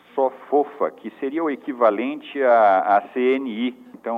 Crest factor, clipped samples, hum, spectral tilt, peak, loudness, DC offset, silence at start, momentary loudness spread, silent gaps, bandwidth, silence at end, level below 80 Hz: 16 dB; under 0.1%; none; -7 dB/octave; -4 dBFS; -21 LUFS; under 0.1%; 0.15 s; 12 LU; none; 5 kHz; 0 s; -80 dBFS